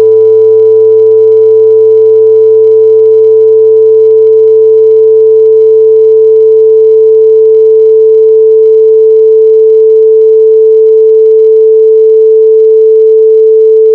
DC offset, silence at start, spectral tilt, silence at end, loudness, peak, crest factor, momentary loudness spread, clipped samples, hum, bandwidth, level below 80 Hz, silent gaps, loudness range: under 0.1%; 0 s; -8.5 dB/octave; 0 s; -4 LUFS; 0 dBFS; 2 dB; 0 LU; 5%; none; 1.1 kHz; -66 dBFS; none; 0 LU